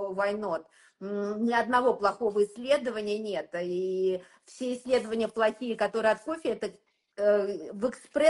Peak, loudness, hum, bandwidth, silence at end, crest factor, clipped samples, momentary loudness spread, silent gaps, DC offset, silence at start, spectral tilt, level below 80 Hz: -10 dBFS; -29 LUFS; none; 11.5 kHz; 0 s; 18 dB; under 0.1%; 10 LU; none; under 0.1%; 0 s; -5 dB/octave; -68 dBFS